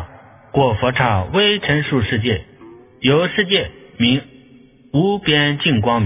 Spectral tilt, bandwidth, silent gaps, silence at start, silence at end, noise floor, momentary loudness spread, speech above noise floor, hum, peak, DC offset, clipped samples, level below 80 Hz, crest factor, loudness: -9.5 dB/octave; 3.9 kHz; none; 0 s; 0 s; -47 dBFS; 7 LU; 30 dB; none; 0 dBFS; under 0.1%; under 0.1%; -40 dBFS; 18 dB; -17 LUFS